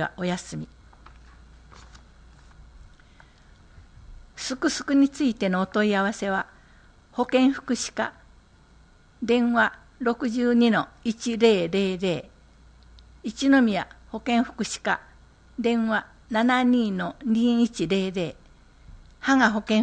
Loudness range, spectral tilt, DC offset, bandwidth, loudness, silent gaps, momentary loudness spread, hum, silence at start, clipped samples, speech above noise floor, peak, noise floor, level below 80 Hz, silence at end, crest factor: 5 LU; -5 dB/octave; under 0.1%; 9.6 kHz; -24 LUFS; none; 12 LU; none; 0 s; under 0.1%; 31 dB; -6 dBFS; -54 dBFS; -52 dBFS; 0 s; 18 dB